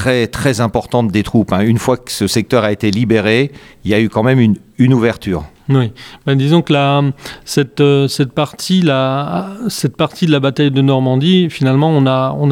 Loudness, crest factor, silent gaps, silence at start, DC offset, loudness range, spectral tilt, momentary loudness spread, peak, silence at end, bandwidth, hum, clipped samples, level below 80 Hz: -14 LUFS; 12 dB; none; 0 s; under 0.1%; 1 LU; -6.5 dB/octave; 7 LU; 0 dBFS; 0 s; 16.5 kHz; none; under 0.1%; -42 dBFS